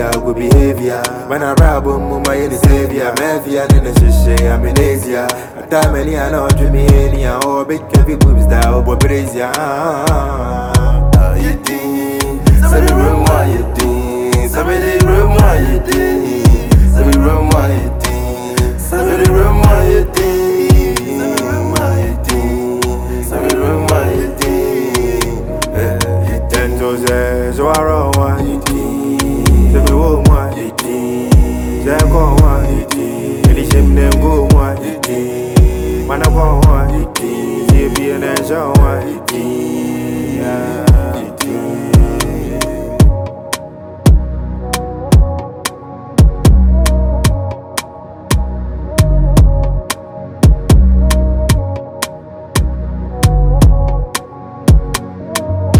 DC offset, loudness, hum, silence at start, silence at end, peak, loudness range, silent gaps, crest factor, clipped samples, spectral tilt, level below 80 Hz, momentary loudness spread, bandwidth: under 0.1%; -13 LUFS; none; 0 s; 0 s; 0 dBFS; 3 LU; none; 10 dB; 0.2%; -6 dB/octave; -14 dBFS; 9 LU; 20 kHz